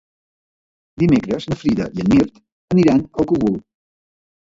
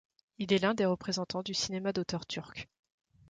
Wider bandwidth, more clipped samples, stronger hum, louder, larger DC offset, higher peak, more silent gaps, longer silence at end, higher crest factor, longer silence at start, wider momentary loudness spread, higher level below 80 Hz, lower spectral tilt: second, 7.8 kHz vs 9.4 kHz; neither; neither; first, -18 LUFS vs -33 LUFS; neither; first, -2 dBFS vs -16 dBFS; first, 2.52-2.68 s vs none; first, 1 s vs 0.65 s; about the same, 16 dB vs 18 dB; first, 1 s vs 0.4 s; second, 7 LU vs 15 LU; first, -44 dBFS vs -66 dBFS; first, -8 dB/octave vs -4.5 dB/octave